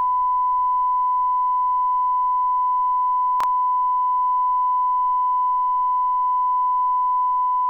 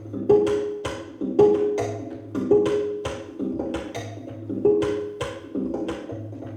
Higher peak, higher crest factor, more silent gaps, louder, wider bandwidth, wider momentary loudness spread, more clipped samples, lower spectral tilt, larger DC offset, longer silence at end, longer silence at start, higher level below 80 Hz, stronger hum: second, -16 dBFS vs -6 dBFS; second, 4 dB vs 18 dB; neither; first, -20 LUFS vs -24 LUFS; second, 3.7 kHz vs 9.8 kHz; second, 0 LU vs 14 LU; neither; second, -2.5 dB/octave vs -6.5 dB/octave; neither; about the same, 0 s vs 0 s; about the same, 0 s vs 0 s; about the same, -56 dBFS vs -52 dBFS; neither